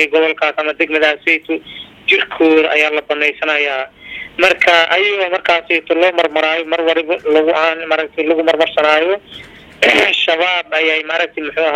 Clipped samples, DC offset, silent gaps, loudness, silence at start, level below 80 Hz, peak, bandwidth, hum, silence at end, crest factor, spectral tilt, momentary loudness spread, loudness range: under 0.1%; under 0.1%; none; -13 LUFS; 0 s; -56 dBFS; 0 dBFS; 13.5 kHz; none; 0 s; 14 dB; -2.5 dB/octave; 8 LU; 1 LU